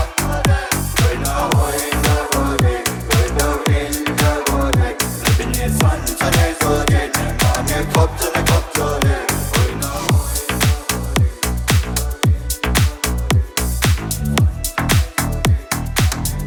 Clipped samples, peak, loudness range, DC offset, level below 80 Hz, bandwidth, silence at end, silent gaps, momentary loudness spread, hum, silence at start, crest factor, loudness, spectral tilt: under 0.1%; 0 dBFS; 2 LU; under 0.1%; -24 dBFS; over 20 kHz; 0 s; none; 4 LU; none; 0 s; 16 dB; -17 LUFS; -4.5 dB/octave